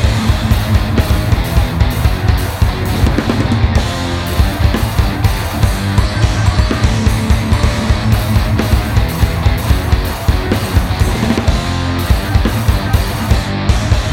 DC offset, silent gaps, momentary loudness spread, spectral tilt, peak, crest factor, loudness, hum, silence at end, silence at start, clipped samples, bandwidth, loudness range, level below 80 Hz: under 0.1%; none; 2 LU; -6 dB/octave; 0 dBFS; 12 dB; -14 LUFS; none; 0 s; 0 s; under 0.1%; 17 kHz; 1 LU; -16 dBFS